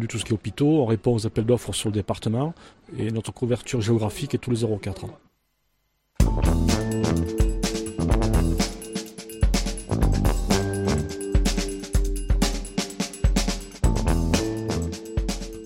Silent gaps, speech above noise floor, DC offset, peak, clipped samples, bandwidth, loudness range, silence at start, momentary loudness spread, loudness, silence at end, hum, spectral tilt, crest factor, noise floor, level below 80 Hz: none; 47 dB; under 0.1%; -6 dBFS; under 0.1%; 16.5 kHz; 2 LU; 0 s; 8 LU; -25 LUFS; 0 s; none; -5.5 dB/octave; 18 dB; -71 dBFS; -28 dBFS